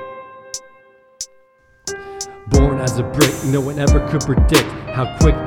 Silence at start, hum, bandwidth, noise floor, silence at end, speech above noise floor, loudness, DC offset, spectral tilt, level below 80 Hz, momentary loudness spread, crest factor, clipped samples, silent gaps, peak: 0 s; none; 19 kHz; -53 dBFS; 0 s; 38 dB; -17 LUFS; under 0.1%; -5.5 dB/octave; -22 dBFS; 16 LU; 18 dB; under 0.1%; none; 0 dBFS